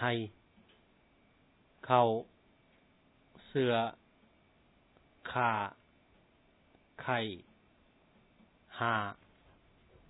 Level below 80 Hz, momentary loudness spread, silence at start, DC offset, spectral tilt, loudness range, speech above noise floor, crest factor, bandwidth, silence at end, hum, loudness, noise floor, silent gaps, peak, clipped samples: -74 dBFS; 21 LU; 0 s; under 0.1%; -3.5 dB/octave; 5 LU; 36 dB; 26 dB; 4.1 kHz; 0.95 s; none; -34 LUFS; -68 dBFS; none; -12 dBFS; under 0.1%